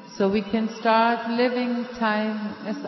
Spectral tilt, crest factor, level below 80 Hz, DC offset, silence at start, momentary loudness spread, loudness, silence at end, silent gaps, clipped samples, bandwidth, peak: -6 dB/octave; 16 dB; -60 dBFS; under 0.1%; 0 s; 8 LU; -24 LUFS; 0 s; none; under 0.1%; 6 kHz; -8 dBFS